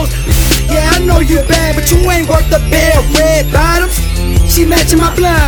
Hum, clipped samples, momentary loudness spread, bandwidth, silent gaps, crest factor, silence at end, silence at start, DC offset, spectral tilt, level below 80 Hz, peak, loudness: none; 0.4%; 3 LU; over 20 kHz; none; 8 dB; 0 s; 0 s; under 0.1%; -4.5 dB/octave; -12 dBFS; 0 dBFS; -10 LUFS